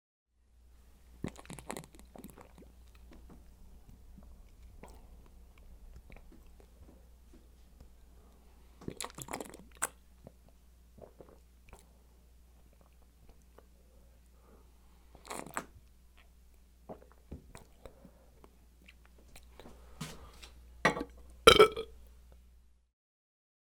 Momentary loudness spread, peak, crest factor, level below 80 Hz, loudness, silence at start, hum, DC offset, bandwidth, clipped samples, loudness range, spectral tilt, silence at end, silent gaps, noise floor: 31 LU; -4 dBFS; 36 dB; -56 dBFS; -31 LUFS; 1.25 s; none; under 0.1%; 17.5 kHz; under 0.1%; 28 LU; -3 dB/octave; 1.95 s; none; -63 dBFS